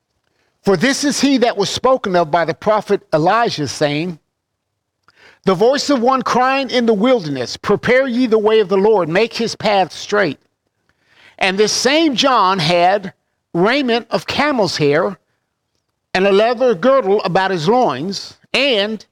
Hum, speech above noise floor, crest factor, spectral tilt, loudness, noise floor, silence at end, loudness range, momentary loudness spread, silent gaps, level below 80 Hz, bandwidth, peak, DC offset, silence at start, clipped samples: none; 59 dB; 14 dB; -4.5 dB/octave; -15 LUFS; -73 dBFS; 0.15 s; 3 LU; 7 LU; none; -54 dBFS; 15.5 kHz; -2 dBFS; under 0.1%; 0.65 s; under 0.1%